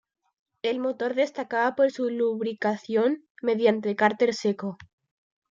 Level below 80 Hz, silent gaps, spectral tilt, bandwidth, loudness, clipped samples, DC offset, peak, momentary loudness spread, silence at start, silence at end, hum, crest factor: -74 dBFS; 3.30-3.35 s; -5.5 dB/octave; 7.6 kHz; -26 LUFS; under 0.1%; under 0.1%; -8 dBFS; 7 LU; 0.65 s; 0.75 s; none; 18 dB